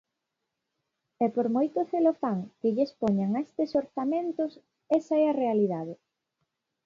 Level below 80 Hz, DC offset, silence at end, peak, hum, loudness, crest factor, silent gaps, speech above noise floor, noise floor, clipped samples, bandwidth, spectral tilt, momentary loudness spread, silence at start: -72 dBFS; under 0.1%; 0.9 s; -12 dBFS; none; -28 LUFS; 16 dB; none; 57 dB; -84 dBFS; under 0.1%; 7.4 kHz; -9 dB/octave; 7 LU; 1.2 s